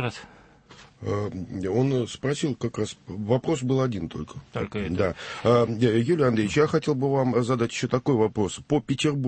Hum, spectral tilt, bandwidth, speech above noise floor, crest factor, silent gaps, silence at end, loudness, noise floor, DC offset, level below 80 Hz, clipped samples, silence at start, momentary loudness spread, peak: none; -6.5 dB/octave; 8.8 kHz; 27 dB; 16 dB; none; 0 s; -25 LUFS; -51 dBFS; under 0.1%; -52 dBFS; under 0.1%; 0 s; 10 LU; -8 dBFS